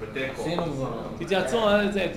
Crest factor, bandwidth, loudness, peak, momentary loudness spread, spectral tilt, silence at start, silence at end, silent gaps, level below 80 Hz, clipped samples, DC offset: 16 dB; 16 kHz; -26 LUFS; -10 dBFS; 10 LU; -5.5 dB/octave; 0 s; 0 s; none; -48 dBFS; under 0.1%; under 0.1%